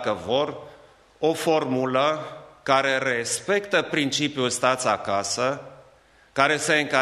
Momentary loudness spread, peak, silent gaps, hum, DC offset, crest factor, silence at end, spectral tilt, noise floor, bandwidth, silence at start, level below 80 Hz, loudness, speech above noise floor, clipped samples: 10 LU; -4 dBFS; none; none; under 0.1%; 22 dB; 0 s; -3 dB/octave; -56 dBFS; 14.5 kHz; 0 s; -64 dBFS; -23 LUFS; 32 dB; under 0.1%